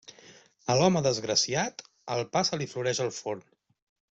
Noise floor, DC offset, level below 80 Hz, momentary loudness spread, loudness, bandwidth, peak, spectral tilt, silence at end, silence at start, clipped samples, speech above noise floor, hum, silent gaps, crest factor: -55 dBFS; under 0.1%; -66 dBFS; 13 LU; -28 LUFS; 8.2 kHz; -8 dBFS; -3.5 dB/octave; 0.75 s; 0.1 s; under 0.1%; 27 dB; none; none; 22 dB